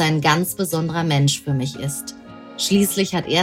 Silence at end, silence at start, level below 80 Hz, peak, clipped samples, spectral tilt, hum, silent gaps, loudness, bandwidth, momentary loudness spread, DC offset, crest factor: 0 s; 0 s; -54 dBFS; -2 dBFS; under 0.1%; -4.5 dB/octave; none; none; -20 LUFS; 16.5 kHz; 12 LU; under 0.1%; 20 dB